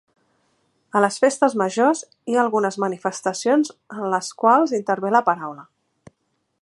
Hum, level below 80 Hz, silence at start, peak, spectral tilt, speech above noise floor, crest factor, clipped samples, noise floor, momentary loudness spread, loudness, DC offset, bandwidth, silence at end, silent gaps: none; -76 dBFS; 0.95 s; -2 dBFS; -4.5 dB/octave; 52 dB; 20 dB; under 0.1%; -72 dBFS; 8 LU; -20 LUFS; under 0.1%; 11.5 kHz; 1 s; none